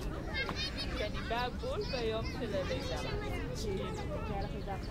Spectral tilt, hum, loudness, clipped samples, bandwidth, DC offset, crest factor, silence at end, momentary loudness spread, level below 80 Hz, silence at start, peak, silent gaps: -5.5 dB/octave; none; -37 LUFS; under 0.1%; 16 kHz; under 0.1%; 14 dB; 0 s; 3 LU; -44 dBFS; 0 s; -22 dBFS; none